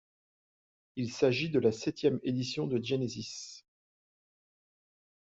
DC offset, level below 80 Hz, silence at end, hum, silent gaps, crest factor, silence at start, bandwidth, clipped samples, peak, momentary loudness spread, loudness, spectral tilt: under 0.1%; -70 dBFS; 1.65 s; none; none; 20 dB; 0.95 s; 8 kHz; under 0.1%; -14 dBFS; 13 LU; -32 LUFS; -5.5 dB/octave